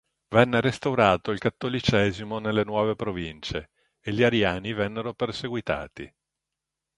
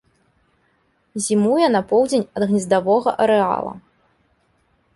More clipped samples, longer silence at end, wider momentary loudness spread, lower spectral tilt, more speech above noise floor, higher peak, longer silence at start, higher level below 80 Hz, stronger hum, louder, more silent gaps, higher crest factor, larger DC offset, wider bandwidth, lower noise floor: neither; second, 0.9 s vs 1.15 s; first, 12 LU vs 9 LU; about the same, -6 dB/octave vs -5 dB/octave; first, 61 dB vs 46 dB; first, 0 dBFS vs -4 dBFS; second, 0.3 s vs 1.15 s; first, -50 dBFS vs -60 dBFS; neither; second, -25 LUFS vs -18 LUFS; neither; first, 26 dB vs 16 dB; neither; about the same, 11.5 kHz vs 11.5 kHz; first, -86 dBFS vs -63 dBFS